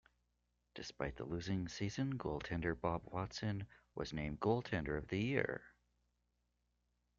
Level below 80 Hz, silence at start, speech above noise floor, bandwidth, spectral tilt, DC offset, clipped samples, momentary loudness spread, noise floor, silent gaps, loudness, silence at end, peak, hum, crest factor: -60 dBFS; 0.75 s; 42 dB; 7.6 kHz; -5.5 dB/octave; under 0.1%; under 0.1%; 10 LU; -83 dBFS; none; -42 LUFS; 1.5 s; -20 dBFS; 60 Hz at -60 dBFS; 22 dB